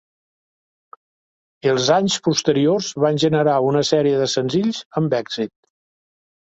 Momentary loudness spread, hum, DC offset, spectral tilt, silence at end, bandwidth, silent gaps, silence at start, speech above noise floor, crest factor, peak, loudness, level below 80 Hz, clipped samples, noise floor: 7 LU; none; under 0.1%; -5 dB/octave; 1 s; 8.2 kHz; 4.85-4.90 s; 1.65 s; over 72 dB; 18 dB; -2 dBFS; -19 LUFS; -62 dBFS; under 0.1%; under -90 dBFS